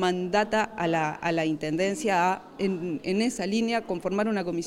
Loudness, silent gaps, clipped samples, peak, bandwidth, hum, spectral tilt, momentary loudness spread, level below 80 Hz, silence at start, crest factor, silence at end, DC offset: -27 LUFS; none; under 0.1%; -12 dBFS; 15 kHz; none; -5 dB/octave; 5 LU; -60 dBFS; 0 s; 16 dB; 0 s; under 0.1%